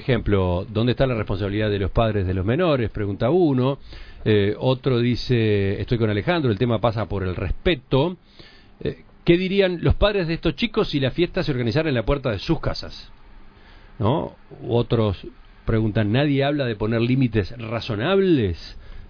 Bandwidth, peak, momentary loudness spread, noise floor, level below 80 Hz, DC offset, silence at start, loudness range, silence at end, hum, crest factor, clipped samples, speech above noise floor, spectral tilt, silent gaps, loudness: 5.4 kHz; -6 dBFS; 9 LU; -46 dBFS; -36 dBFS; under 0.1%; 0 s; 4 LU; 0 s; none; 16 dB; under 0.1%; 25 dB; -8.5 dB/octave; none; -22 LUFS